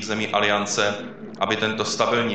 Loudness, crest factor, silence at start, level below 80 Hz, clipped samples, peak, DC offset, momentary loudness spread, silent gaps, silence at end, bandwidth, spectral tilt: -22 LUFS; 18 dB; 0 s; -62 dBFS; under 0.1%; -4 dBFS; 0.3%; 8 LU; none; 0 s; 9 kHz; -3 dB/octave